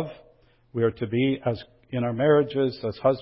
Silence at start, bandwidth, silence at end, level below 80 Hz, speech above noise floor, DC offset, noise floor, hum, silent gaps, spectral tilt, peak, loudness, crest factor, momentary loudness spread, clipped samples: 0 s; 5.8 kHz; 0 s; -56 dBFS; 35 dB; under 0.1%; -59 dBFS; none; none; -11.5 dB/octave; -8 dBFS; -25 LUFS; 16 dB; 14 LU; under 0.1%